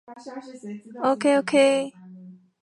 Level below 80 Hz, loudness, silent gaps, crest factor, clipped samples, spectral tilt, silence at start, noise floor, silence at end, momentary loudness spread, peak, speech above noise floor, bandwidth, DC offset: -78 dBFS; -21 LUFS; none; 18 dB; under 0.1%; -4 dB/octave; 0.1 s; -46 dBFS; 0.3 s; 20 LU; -6 dBFS; 23 dB; 11.5 kHz; under 0.1%